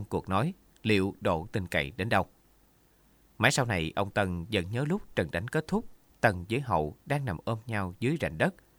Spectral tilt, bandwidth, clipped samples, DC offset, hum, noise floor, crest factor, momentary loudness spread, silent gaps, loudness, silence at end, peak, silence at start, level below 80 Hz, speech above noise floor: -5.5 dB/octave; over 20 kHz; under 0.1%; under 0.1%; none; -64 dBFS; 24 dB; 6 LU; none; -30 LUFS; 0.25 s; -6 dBFS; 0 s; -52 dBFS; 34 dB